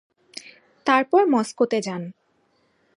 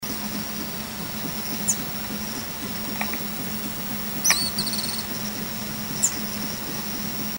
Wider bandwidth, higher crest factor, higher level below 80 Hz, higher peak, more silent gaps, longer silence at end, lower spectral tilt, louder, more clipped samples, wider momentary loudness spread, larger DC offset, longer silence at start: second, 11.5 kHz vs 16.5 kHz; about the same, 20 dB vs 24 dB; second, -76 dBFS vs -48 dBFS; about the same, -4 dBFS vs -4 dBFS; neither; first, 0.85 s vs 0 s; first, -5 dB/octave vs -2 dB/octave; first, -21 LUFS vs -25 LUFS; neither; first, 22 LU vs 7 LU; neither; first, 0.35 s vs 0 s